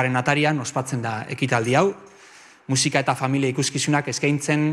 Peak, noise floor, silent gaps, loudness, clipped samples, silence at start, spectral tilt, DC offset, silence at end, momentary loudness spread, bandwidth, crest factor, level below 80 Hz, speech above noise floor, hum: -6 dBFS; -48 dBFS; none; -22 LUFS; under 0.1%; 0 s; -4.5 dB/octave; under 0.1%; 0 s; 7 LU; 13.5 kHz; 16 dB; -62 dBFS; 27 dB; none